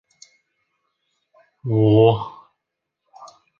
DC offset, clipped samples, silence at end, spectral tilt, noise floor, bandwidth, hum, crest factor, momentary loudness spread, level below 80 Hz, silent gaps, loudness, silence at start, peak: under 0.1%; under 0.1%; 0.35 s; -9 dB/octave; -81 dBFS; 7 kHz; none; 20 dB; 20 LU; -56 dBFS; none; -17 LUFS; 1.65 s; -2 dBFS